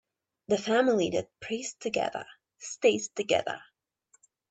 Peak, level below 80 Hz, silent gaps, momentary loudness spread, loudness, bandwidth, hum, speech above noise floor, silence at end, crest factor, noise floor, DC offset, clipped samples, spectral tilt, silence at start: -10 dBFS; -70 dBFS; none; 16 LU; -29 LUFS; 8.8 kHz; none; 40 dB; 0.9 s; 20 dB; -68 dBFS; under 0.1%; under 0.1%; -3.5 dB/octave; 0.5 s